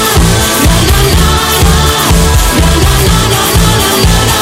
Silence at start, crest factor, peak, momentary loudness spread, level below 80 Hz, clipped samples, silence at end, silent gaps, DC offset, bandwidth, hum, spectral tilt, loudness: 0 s; 8 dB; 0 dBFS; 1 LU; -12 dBFS; 0.3%; 0 s; none; under 0.1%; 16.5 kHz; none; -4 dB/octave; -7 LUFS